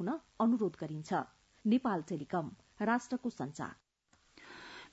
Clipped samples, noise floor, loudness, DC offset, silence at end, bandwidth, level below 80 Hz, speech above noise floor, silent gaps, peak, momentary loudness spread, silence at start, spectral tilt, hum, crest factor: under 0.1%; -72 dBFS; -36 LUFS; under 0.1%; 0.05 s; 7.6 kHz; -74 dBFS; 36 dB; none; -20 dBFS; 18 LU; 0 s; -6 dB/octave; none; 18 dB